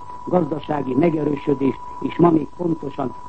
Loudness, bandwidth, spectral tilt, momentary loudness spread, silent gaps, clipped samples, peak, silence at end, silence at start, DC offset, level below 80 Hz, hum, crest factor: -21 LUFS; 8 kHz; -9.5 dB/octave; 9 LU; none; under 0.1%; -2 dBFS; 0 s; 0 s; 1%; -50 dBFS; none; 18 dB